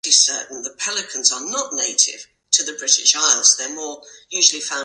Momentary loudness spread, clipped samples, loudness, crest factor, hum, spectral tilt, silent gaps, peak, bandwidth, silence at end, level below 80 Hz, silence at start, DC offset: 14 LU; under 0.1%; -16 LUFS; 20 dB; none; 3 dB/octave; none; 0 dBFS; 11.5 kHz; 0 s; -74 dBFS; 0.05 s; under 0.1%